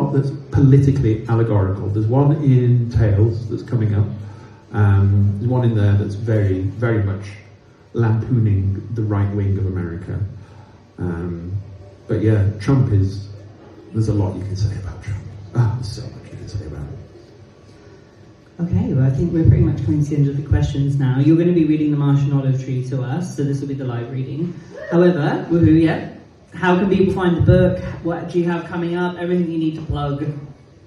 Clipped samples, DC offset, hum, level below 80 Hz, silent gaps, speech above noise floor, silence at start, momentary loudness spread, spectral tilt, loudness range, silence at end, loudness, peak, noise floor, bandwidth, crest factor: under 0.1%; under 0.1%; none; -38 dBFS; none; 29 dB; 0 s; 15 LU; -9 dB/octave; 8 LU; 0.35 s; -18 LUFS; 0 dBFS; -46 dBFS; 7.2 kHz; 18 dB